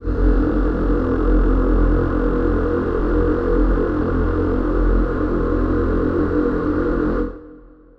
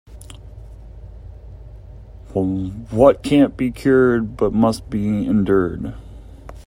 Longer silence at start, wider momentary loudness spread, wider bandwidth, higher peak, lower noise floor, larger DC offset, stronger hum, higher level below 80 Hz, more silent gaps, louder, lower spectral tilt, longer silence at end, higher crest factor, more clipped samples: about the same, 0 s vs 0.1 s; second, 2 LU vs 25 LU; second, 4.6 kHz vs 14.5 kHz; second, -4 dBFS vs 0 dBFS; first, -43 dBFS vs -38 dBFS; neither; neither; first, -22 dBFS vs -38 dBFS; neither; about the same, -19 LUFS vs -18 LUFS; first, -10.5 dB/octave vs -7.5 dB/octave; first, 0.3 s vs 0.05 s; second, 12 dB vs 20 dB; neither